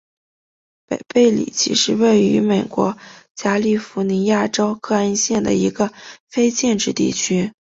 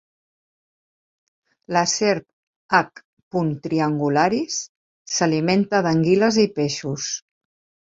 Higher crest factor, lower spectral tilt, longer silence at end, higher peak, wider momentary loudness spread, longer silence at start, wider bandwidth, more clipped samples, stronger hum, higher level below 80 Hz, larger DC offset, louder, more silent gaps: about the same, 16 dB vs 20 dB; about the same, -4 dB/octave vs -4.5 dB/octave; second, 0.25 s vs 0.75 s; about the same, -2 dBFS vs -2 dBFS; about the same, 8 LU vs 10 LU; second, 0.9 s vs 1.7 s; about the same, 8 kHz vs 7.8 kHz; neither; neither; first, -56 dBFS vs -62 dBFS; neither; first, -18 LUFS vs -21 LUFS; second, 3.30-3.35 s, 6.20-6.27 s vs 2.33-2.69 s, 3.05-3.17 s, 3.23-3.31 s, 4.69-5.05 s